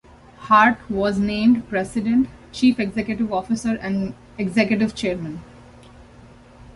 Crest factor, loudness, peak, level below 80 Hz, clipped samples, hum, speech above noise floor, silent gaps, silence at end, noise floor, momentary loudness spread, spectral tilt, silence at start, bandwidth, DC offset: 18 dB; -20 LUFS; -2 dBFS; -48 dBFS; under 0.1%; none; 26 dB; none; 0.75 s; -46 dBFS; 12 LU; -6 dB/octave; 0.4 s; 11.5 kHz; under 0.1%